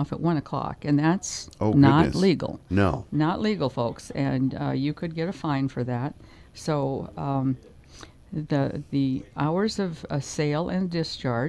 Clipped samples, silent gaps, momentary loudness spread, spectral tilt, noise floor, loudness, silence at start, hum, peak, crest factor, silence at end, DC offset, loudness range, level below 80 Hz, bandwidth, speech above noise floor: under 0.1%; none; 9 LU; -6.5 dB/octave; -47 dBFS; -26 LUFS; 0 s; none; -4 dBFS; 22 dB; 0 s; under 0.1%; 7 LU; -48 dBFS; 11 kHz; 23 dB